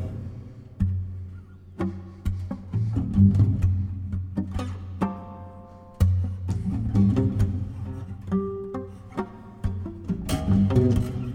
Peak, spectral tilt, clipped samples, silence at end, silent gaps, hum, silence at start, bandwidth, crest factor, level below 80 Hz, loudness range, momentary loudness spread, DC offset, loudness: -8 dBFS; -8.5 dB/octave; under 0.1%; 0 s; none; none; 0 s; 12 kHz; 18 dB; -38 dBFS; 4 LU; 18 LU; under 0.1%; -26 LUFS